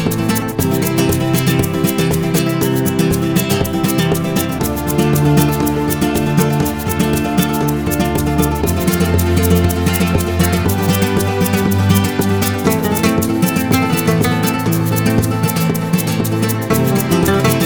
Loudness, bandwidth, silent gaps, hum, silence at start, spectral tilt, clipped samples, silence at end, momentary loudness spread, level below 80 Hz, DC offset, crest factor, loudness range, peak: -15 LUFS; over 20 kHz; none; none; 0 s; -5.5 dB/octave; under 0.1%; 0 s; 3 LU; -32 dBFS; under 0.1%; 14 dB; 1 LU; 0 dBFS